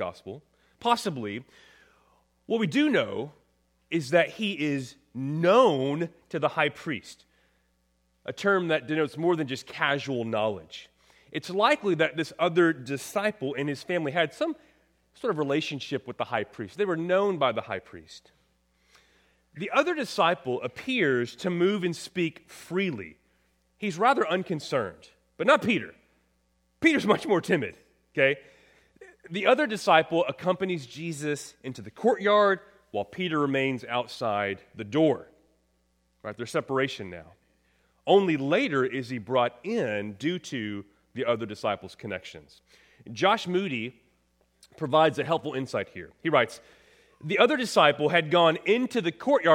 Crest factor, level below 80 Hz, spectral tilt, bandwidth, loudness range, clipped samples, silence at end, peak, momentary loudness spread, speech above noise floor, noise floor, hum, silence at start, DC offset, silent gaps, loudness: 24 dB; -70 dBFS; -5.5 dB/octave; 16 kHz; 5 LU; under 0.1%; 0 s; -4 dBFS; 15 LU; 44 dB; -70 dBFS; none; 0 s; under 0.1%; none; -27 LUFS